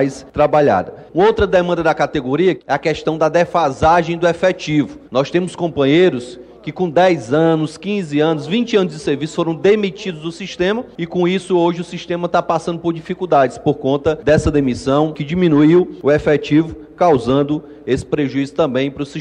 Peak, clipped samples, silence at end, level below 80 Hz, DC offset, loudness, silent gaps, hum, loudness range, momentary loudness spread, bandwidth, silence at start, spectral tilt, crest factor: -2 dBFS; under 0.1%; 0 s; -40 dBFS; under 0.1%; -16 LUFS; none; none; 3 LU; 9 LU; 10.5 kHz; 0 s; -6.5 dB/octave; 12 dB